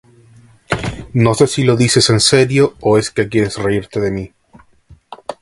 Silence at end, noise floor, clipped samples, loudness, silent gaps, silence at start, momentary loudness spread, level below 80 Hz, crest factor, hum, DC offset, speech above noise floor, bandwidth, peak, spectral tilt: 0.1 s; -47 dBFS; under 0.1%; -14 LUFS; none; 0.7 s; 12 LU; -40 dBFS; 16 dB; none; under 0.1%; 34 dB; 11.5 kHz; 0 dBFS; -4.5 dB/octave